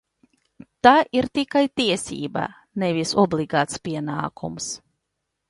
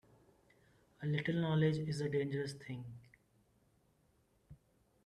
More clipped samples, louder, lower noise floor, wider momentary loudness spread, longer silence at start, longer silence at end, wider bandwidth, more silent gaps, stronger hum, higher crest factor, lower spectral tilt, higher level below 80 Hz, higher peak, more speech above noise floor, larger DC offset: neither; first, -22 LUFS vs -38 LUFS; first, -79 dBFS vs -74 dBFS; about the same, 14 LU vs 15 LU; second, 0.85 s vs 1 s; first, 0.7 s vs 0.5 s; about the same, 11.5 kHz vs 11 kHz; neither; neither; about the same, 22 dB vs 20 dB; second, -4.5 dB/octave vs -7 dB/octave; first, -56 dBFS vs -72 dBFS; first, -2 dBFS vs -22 dBFS; first, 57 dB vs 38 dB; neither